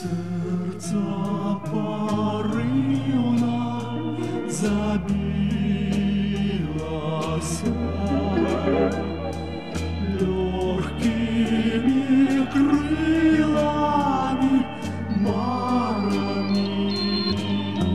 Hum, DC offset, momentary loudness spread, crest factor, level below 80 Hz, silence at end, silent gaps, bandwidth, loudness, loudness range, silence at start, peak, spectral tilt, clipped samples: none; 0.7%; 8 LU; 14 dB; -40 dBFS; 0 s; none; 12.5 kHz; -23 LUFS; 4 LU; 0 s; -8 dBFS; -6.5 dB/octave; under 0.1%